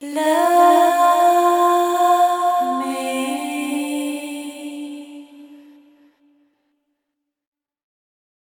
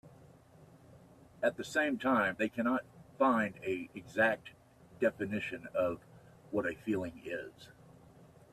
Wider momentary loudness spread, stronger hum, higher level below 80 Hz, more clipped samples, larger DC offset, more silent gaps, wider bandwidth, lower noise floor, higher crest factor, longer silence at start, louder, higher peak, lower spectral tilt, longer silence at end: first, 18 LU vs 11 LU; neither; second, -76 dBFS vs -70 dBFS; neither; neither; neither; first, 18 kHz vs 14 kHz; first, -79 dBFS vs -59 dBFS; second, 16 dB vs 22 dB; about the same, 0 s vs 0.05 s; first, -17 LUFS vs -34 LUFS; first, -2 dBFS vs -14 dBFS; second, -1.5 dB/octave vs -5.5 dB/octave; first, 2.9 s vs 0.85 s